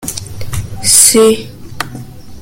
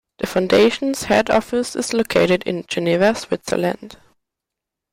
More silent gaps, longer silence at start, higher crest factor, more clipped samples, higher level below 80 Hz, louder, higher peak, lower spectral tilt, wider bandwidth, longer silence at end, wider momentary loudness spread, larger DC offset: neither; second, 0 s vs 0.2 s; about the same, 12 dB vs 14 dB; first, 0.6% vs under 0.1%; first, -34 dBFS vs -50 dBFS; first, -7 LUFS vs -18 LUFS; first, 0 dBFS vs -4 dBFS; second, -2.5 dB/octave vs -4.5 dB/octave; first, over 20 kHz vs 16.5 kHz; second, 0 s vs 1.05 s; first, 20 LU vs 9 LU; neither